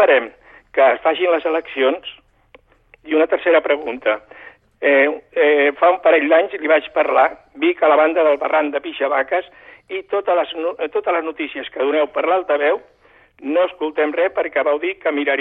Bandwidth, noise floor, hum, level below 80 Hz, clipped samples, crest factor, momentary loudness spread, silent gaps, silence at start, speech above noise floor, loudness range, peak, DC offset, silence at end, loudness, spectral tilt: 4.1 kHz; -52 dBFS; none; -62 dBFS; under 0.1%; 16 dB; 9 LU; none; 0 s; 35 dB; 5 LU; -2 dBFS; under 0.1%; 0 s; -17 LUFS; -6 dB/octave